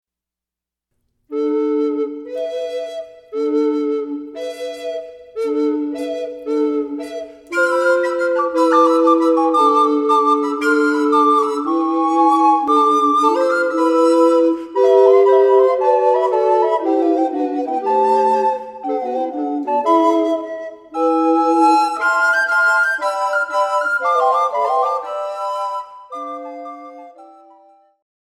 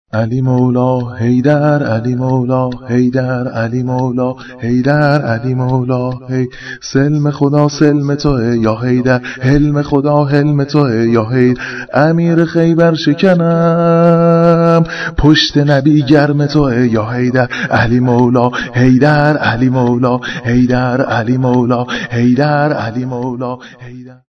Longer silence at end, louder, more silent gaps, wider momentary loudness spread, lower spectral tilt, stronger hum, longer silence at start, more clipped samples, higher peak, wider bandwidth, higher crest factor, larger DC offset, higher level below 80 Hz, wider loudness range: first, 1.05 s vs 0.2 s; second, -16 LUFS vs -12 LUFS; neither; first, 14 LU vs 8 LU; second, -3.5 dB/octave vs -7.5 dB/octave; neither; first, 1.3 s vs 0.15 s; second, under 0.1% vs 0.4%; about the same, -2 dBFS vs 0 dBFS; first, 13.5 kHz vs 6.4 kHz; about the same, 16 dB vs 12 dB; neither; second, -68 dBFS vs -34 dBFS; first, 9 LU vs 5 LU